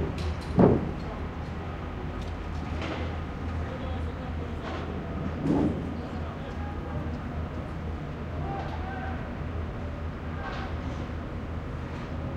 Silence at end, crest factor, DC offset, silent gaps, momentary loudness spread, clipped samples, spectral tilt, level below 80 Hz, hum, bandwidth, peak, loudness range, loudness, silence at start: 0 s; 26 dB; under 0.1%; none; 9 LU; under 0.1%; -8 dB/octave; -40 dBFS; none; 9.4 kHz; -6 dBFS; 5 LU; -32 LUFS; 0 s